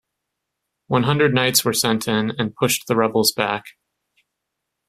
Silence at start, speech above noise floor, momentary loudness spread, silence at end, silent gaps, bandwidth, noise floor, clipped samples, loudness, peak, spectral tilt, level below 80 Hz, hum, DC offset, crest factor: 0.9 s; 60 dB; 6 LU; 1.2 s; none; 16 kHz; -80 dBFS; under 0.1%; -19 LUFS; 0 dBFS; -3.5 dB/octave; -58 dBFS; none; under 0.1%; 20 dB